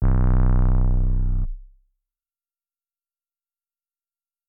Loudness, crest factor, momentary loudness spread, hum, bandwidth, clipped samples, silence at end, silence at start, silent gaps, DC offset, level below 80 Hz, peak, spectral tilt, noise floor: -23 LUFS; 14 dB; 9 LU; none; 2.1 kHz; under 0.1%; 2.85 s; 0 s; none; under 0.1%; -22 dBFS; -8 dBFS; -12 dB/octave; under -90 dBFS